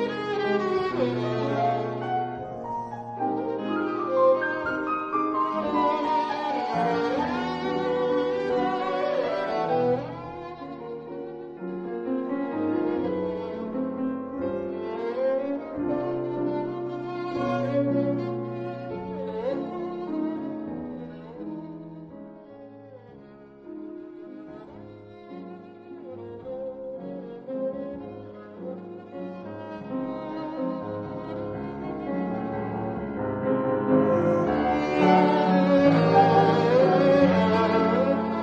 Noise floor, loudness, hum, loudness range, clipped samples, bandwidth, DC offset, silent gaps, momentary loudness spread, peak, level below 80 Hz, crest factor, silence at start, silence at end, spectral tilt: -47 dBFS; -26 LUFS; none; 19 LU; under 0.1%; 7.8 kHz; under 0.1%; none; 20 LU; -6 dBFS; -58 dBFS; 20 dB; 0 s; 0 s; -8 dB/octave